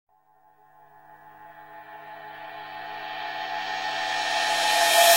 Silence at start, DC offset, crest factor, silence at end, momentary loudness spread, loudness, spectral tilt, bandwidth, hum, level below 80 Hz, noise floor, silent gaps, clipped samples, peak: 1.1 s; under 0.1%; 22 dB; 0 s; 24 LU; -25 LUFS; 1 dB/octave; 16 kHz; none; -72 dBFS; -61 dBFS; none; under 0.1%; -6 dBFS